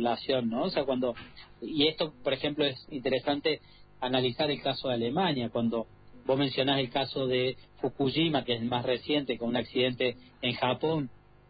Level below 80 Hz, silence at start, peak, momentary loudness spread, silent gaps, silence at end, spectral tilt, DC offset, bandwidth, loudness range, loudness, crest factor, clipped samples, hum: -60 dBFS; 0 s; -12 dBFS; 9 LU; none; 0.35 s; -9.5 dB/octave; under 0.1%; 5 kHz; 1 LU; -30 LUFS; 18 dB; under 0.1%; none